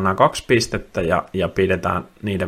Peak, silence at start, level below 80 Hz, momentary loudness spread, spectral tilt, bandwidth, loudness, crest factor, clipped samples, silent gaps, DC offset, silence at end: 0 dBFS; 0 s; -44 dBFS; 7 LU; -5 dB/octave; 15.5 kHz; -20 LUFS; 20 dB; under 0.1%; none; under 0.1%; 0 s